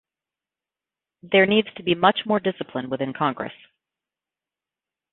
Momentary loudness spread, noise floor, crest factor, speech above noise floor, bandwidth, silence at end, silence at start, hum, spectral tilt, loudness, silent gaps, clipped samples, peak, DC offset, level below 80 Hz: 12 LU; -90 dBFS; 22 dB; 68 dB; 4.2 kHz; 1.6 s; 1.25 s; none; -10 dB/octave; -22 LUFS; none; under 0.1%; -2 dBFS; under 0.1%; -66 dBFS